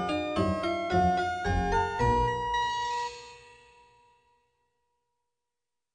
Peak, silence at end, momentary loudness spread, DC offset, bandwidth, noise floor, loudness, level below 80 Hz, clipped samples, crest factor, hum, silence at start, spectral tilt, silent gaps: -14 dBFS; 2.55 s; 8 LU; under 0.1%; 10 kHz; -89 dBFS; -28 LUFS; -42 dBFS; under 0.1%; 18 dB; none; 0 s; -5.5 dB/octave; none